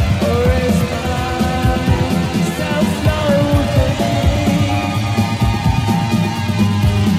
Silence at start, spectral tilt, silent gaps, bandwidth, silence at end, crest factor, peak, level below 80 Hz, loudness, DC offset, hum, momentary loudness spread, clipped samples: 0 s; -6.5 dB/octave; none; 16 kHz; 0 s; 12 dB; -2 dBFS; -26 dBFS; -16 LUFS; under 0.1%; none; 3 LU; under 0.1%